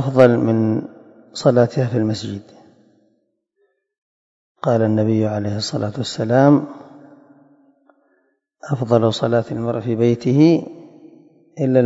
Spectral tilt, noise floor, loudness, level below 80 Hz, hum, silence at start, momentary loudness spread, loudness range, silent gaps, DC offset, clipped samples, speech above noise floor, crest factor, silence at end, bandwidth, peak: -7.5 dB/octave; -67 dBFS; -18 LUFS; -62 dBFS; none; 0 s; 16 LU; 5 LU; 3.98-4.55 s; under 0.1%; under 0.1%; 51 dB; 18 dB; 0 s; 8 kHz; 0 dBFS